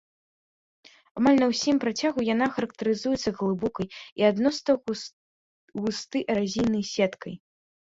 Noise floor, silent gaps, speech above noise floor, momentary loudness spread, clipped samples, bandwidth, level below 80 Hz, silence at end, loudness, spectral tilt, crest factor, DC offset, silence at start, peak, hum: under -90 dBFS; 4.12-4.16 s, 5.13-5.68 s; over 65 dB; 13 LU; under 0.1%; 7.8 kHz; -60 dBFS; 0.55 s; -26 LUFS; -5 dB/octave; 18 dB; under 0.1%; 1.15 s; -8 dBFS; none